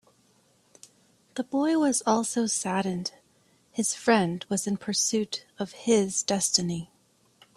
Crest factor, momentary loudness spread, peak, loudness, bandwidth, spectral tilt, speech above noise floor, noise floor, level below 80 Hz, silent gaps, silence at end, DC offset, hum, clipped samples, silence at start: 22 dB; 13 LU; -8 dBFS; -26 LUFS; 14.5 kHz; -3.5 dB/octave; 38 dB; -64 dBFS; -68 dBFS; none; 0.7 s; under 0.1%; none; under 0.1%; 1.35 s